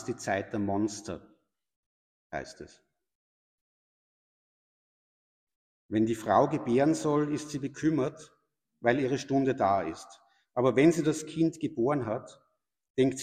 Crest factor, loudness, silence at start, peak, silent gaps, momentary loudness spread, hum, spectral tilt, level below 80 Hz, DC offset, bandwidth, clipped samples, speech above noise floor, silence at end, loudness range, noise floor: 22 dB; -29 LUFS; 0 s; -10 dBFS; 1.76-2.30 s, 3.15-5.47 s, 5.56-5.89 s, 12.90-12.94 s; 14 LU; none; -6 dB/octave; -66 dBFS; under 0.1%; 14.5 kHz; under 0.1%; over 62 dB; 0 s; 20 LU; under -90 dBFS